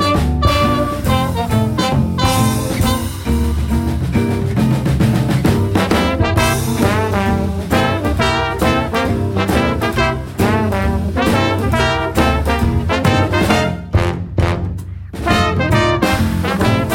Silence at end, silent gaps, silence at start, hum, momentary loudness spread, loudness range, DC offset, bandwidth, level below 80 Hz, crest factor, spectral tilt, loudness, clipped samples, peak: 0 s; none; 0 s; none; 4 LU; 1 LU; under 0.1%; 17 kHz; -24 dBFS; 14 dB; -6 dB/octave; -16 LUFS; under 0.1%; -2 dBFS